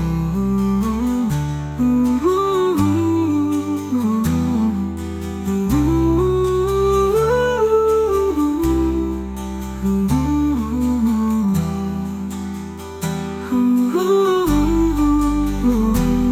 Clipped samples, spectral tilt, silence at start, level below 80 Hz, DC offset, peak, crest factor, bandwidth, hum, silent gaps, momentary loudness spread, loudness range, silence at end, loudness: under 0.1%; -7 dB/octave; 0 s; -30 dBFS; under 0.1%; -6 dBFS; 12 dB; 16.5 kHz; none; none; 9 LU; 3 LU; 0 s; -18 LUFS